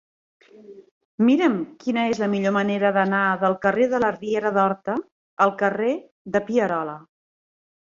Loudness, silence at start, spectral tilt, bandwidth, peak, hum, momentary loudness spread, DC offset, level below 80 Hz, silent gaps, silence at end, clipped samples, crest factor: -22 LUFS; 0.7 s; -6.5 dB/octave; 7.4 kHz; -4 dBFS; none; 8 LU; under 0.1%; -64 dBFS; 0.91-1.18 s, 5.11-5.37 s, 6.11-6.25 s; 0.85 s; under 0.1%; 18 dB